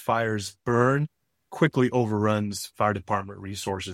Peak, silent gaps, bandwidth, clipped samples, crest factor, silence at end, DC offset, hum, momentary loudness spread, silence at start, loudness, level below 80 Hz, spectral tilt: -6 dBFS; none; 16 kHz; under 0.1%; 20 dB; 0 s; under 0.1%; none; 11 LU; 0 s; -26 LUFS; -60 dBFS; -6 dB/octave